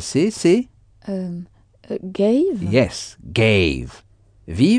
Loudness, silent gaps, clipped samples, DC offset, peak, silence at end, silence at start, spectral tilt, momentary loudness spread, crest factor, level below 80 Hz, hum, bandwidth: -19 LUFS; none; under 0.1%; under 0.1%; -2 dBFS; 0 s; 0 s; -6 dB/octave; 16 LU; 16 dB; -42 dBFS; none; 10 kHz